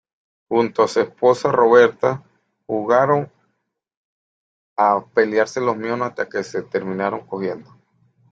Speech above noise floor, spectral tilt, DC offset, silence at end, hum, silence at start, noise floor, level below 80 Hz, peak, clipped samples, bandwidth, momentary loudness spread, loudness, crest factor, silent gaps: 55 dB; -6 dB/octave; under 0.1%; 0.7 s; none; 0.5 s; -74 dBFS; -64 dBFS; -2 dBFS; under 0.1%; 7.8 kHz; 13 LU; -19 LUFS; 18 dB; 3.97-4.76 s